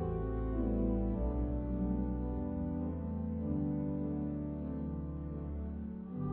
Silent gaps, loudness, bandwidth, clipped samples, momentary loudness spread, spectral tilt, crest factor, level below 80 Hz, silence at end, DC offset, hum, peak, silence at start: none; -38 LUFS; 3.2 kHz; under 0.1%; 7 LU; -12 dB/octave; 14 dB; -42 dBFS; 0 s; under 0.1%; none; -22 dBFS; 0 s